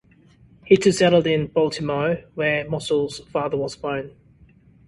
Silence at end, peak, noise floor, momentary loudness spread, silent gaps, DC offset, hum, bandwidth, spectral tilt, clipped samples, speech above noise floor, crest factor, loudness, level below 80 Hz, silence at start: 0.8 s; -2 dBFS; -53 dBFS; 11 LU; none; under 0.1%; none; 11.5 kHz; -5.5 dB/octave; under 0.1%; 32 dB; 20 dB; -21 LUFS; -54 dBFS; 0.65 s